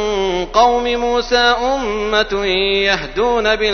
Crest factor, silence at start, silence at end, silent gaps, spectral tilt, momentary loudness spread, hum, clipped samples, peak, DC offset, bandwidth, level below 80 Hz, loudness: 16 dB; 0 s; 0 s; none; -3 dB/octave; 4 LU; none; under 0.1%; 0 dBFS; under 0.1%; 6.6 kHz; -34 dBFS; -15 LUFS